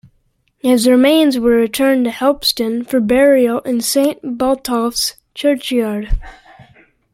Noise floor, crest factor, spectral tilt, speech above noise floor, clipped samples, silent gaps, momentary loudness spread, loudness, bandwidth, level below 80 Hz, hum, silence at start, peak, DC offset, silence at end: -61 dBFS; 14 dB; -3.5 dB/octave; 47 dB; under 0.1%; none; 9 LU; -15 LUFS; 16.5 kHz; -32 dBFS; none; 0.65 s; 0 dBFS; under 0.1%; 0.8 s